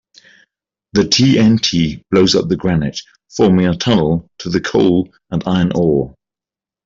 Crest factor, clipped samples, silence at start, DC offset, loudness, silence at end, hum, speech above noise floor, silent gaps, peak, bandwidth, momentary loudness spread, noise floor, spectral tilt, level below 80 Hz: 14 dB; under 0.1%; 0.95 s; under 0.1%; -14 LUFS; 0.75 s; none; 75 dB; none; -2 dBFS; 7.6 kHz; 10 LU; -89 dBFS; -5.5 dB/octave; -42 dBFS